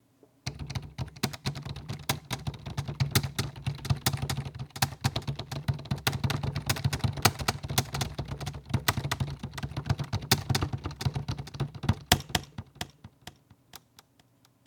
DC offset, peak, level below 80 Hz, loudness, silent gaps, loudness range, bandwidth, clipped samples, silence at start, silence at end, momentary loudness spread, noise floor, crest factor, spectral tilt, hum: under 0.1%; 0 dBFS; -46 dBFS; -32 LUFS; none; 3 LU; 19 kHz; under 0.1%; 0.45 s; 0.9 s; 14 LU; -64 dBFS; 32 dB; -4 dB/octave; none